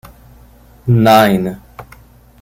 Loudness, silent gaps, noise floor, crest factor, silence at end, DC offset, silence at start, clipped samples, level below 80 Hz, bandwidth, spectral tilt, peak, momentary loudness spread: -12 LUFS; none; -43 dBFS; 14 dB; 0.6 s; under 0.1%; 0.85 s; under 0.1%; -42 dBFS; 16.5 kHz; -6.5 dB/octave; 0 dBFS; 17 LU